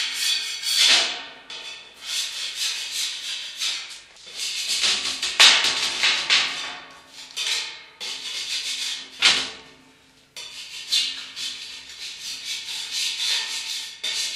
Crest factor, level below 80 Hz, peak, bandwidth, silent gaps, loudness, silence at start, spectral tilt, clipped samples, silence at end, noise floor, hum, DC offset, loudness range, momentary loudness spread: 26 dB; -66 dBFS; 0 dBFS; 15.5 kHz; none; -21 LUFS; 0 s; 2.5 dB/octave; under 0.1%; 0 s; -55 dBFS; none; under 0.1%; 8 LU; 19 LU